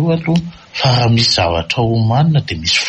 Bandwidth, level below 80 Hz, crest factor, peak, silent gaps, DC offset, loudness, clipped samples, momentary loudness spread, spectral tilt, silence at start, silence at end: 8.6 kHz; -38 dBFS; 12 dB; -2 dBFS; none; under 0.1%; -14 LUFS; under 0.1%; 6 LU; -5 dB/octave; 0 s; 0 s